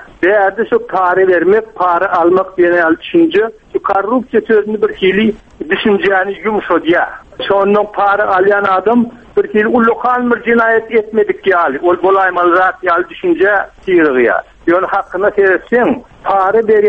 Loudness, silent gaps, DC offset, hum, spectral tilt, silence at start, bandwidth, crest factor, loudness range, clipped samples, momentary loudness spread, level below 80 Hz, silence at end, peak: -12 LUFS; none; under 0.1%; none; -7.5 dB/octave; 0 s; 5.4 kHz; 12 dB; 2 LU; under 0.1%; 5 LU; -46 dBFS; 0 s; 0 dBFS